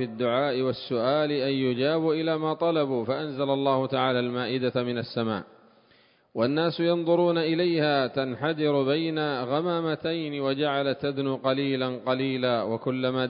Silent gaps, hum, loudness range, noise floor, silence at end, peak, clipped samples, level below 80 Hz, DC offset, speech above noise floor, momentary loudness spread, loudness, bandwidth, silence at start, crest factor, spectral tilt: none; none; 3 LU; -61 dBFS; 0 s; -10 dBFS; under 0.1%; -68 dBFS; under 0.1%; 35 dB; 5 LU; -26 LUFS; 5.4 kHz; 0 s; 16 dB; -10.5 dB/octave